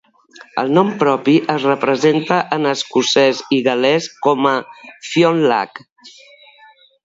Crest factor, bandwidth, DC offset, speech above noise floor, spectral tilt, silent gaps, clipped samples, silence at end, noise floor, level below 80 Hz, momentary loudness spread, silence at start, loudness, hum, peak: 16 dB; 7.8 kHz; under 0.1%; 32 dB; -5 dB/octave; 5.92-5.96 s; under 0.1%; 0.95 s; -48 dBFS; -66 dBFS; 9 LU; 0.4 s; -16 LUFS; none; 0 dBFS